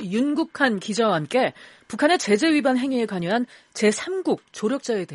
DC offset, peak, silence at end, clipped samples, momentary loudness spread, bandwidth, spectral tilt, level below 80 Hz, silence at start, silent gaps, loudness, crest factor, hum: under 0.1%; -6 dBFS; 0 s; under 0.1%; 7 LU; 11.5 kHz; -4.5 dB/octave; -68 dBFS; 0 s; none; -22 LUFS; 16 dB; none